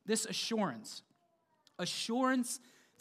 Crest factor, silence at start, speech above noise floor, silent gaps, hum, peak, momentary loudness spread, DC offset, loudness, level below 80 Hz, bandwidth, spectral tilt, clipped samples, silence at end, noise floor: 18 dB; 0.05 s; 40 dB; none; none; -18 dBFS; 16 LU; under 0.1%; -35 LUFS; under -90 dBFS; 15.5 kHz; -3 dB/octave; under 0.1%; 0.45 s; -75 dBFS